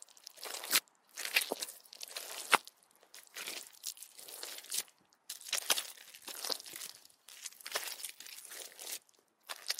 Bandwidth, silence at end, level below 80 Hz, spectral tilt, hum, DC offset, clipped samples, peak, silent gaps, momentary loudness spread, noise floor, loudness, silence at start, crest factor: 16 kHz; 0 s; under -90 dBFS; 2 dB/octave; none; under 0.1%; under 0.1%; -8 dBFS; none; 18 LU; -69 dBFS; -38 LUFS; 0.25 s; 34 dB